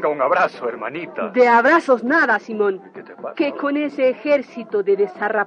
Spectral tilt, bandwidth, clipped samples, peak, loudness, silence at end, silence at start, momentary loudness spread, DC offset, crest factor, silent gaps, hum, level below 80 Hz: -5.5 dB/octave; 9 kHz; under 0.1%; -4 dBFS; -18 LUFS; 0 s; 0 s; 14 LU; under 0.1%; 16 dB; none; none; -78 dBFS